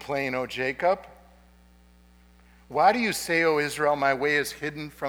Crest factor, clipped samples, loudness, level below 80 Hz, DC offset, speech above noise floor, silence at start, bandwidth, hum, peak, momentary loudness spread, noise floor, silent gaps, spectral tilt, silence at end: 20 dB; under 0.1%; -25 LUFS; -58 dBFS; under 0.1%; 30 dB; 0 s; over 20 kHz; 60 Hz at -55 dBFS; -6 dBFS; 10 LU; -56 dBFS; none; -4 dB/octave; 0 s